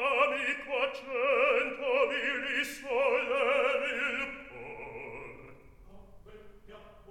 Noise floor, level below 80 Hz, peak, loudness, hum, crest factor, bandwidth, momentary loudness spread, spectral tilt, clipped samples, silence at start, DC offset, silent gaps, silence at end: -52 dBFS; -62 dBFS; -14 dBFS; -29 LUFS; none; 18 dB; 16 kHz; 16 LU; -3 dB/octave; under 0.1%; 0 s; under 0.1%; none; 0.15 s